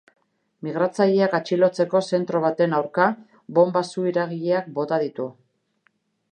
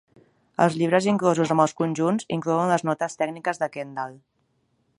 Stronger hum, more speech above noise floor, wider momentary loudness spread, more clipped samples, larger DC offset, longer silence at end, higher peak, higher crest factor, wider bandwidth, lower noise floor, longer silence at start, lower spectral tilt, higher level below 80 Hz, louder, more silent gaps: neither; about the same, 46 dB vs 46 dB; second, 9 LU vs 12 LU; neither; neither; first, 1 s vs 0.85 s; about the same, -2 dBFS vs -4 dBFS; about the same, 20 dB vs 20 dB; second, 9.4 kHz vs 11.5 kHz; about the same, -67 dBFS vs -69 dBFS; about the same, 0.65 s vs 0.6 s; about the same, -6.5 dB/octave vs -6 dB/octave; second, -78 dBFS vs -70 dBFS; about the same, -22 LUFS vs -23 LUFS; neither